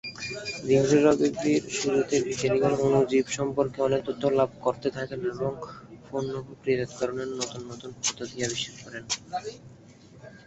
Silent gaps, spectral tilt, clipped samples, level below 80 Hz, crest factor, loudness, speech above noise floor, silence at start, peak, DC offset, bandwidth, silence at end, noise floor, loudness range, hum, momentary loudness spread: none; -4.5 dB/octave; under 0.1%; -58 dBFS; 20 dB; -27 LUFS; 24 dB; 0.05 s; -8 dBFS; under 0.1%; 8.2 kHz; 0.1 s; -51 dBFS; 8 LU; none; 13 LU